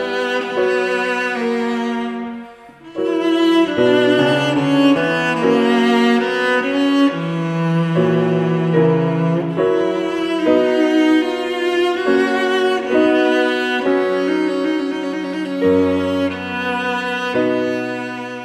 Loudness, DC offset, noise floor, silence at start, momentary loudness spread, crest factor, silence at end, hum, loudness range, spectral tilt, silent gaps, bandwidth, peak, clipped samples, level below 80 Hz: -17 LUFS; under 0.1%; -39 dBFS; 0 s; 7 LU; 16 dB; 0 s; none; 4 LU; -6.5 dB/octave; none; 13 kHz; -2 dBFS; under 0.1%; -58 dBFS